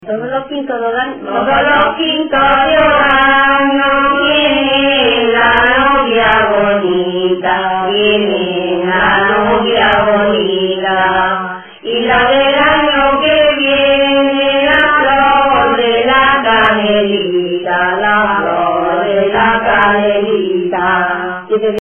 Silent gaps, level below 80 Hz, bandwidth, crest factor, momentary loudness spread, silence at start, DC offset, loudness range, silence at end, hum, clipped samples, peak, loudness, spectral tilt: none; -38 dBFS; 3.6 kHz; 10 dB; 7 LU; 0 s; under 0.1%; 3 LU; 0 s; none; under 0.1%; 0 dBFS; -11 LUFS; -7 dB/octave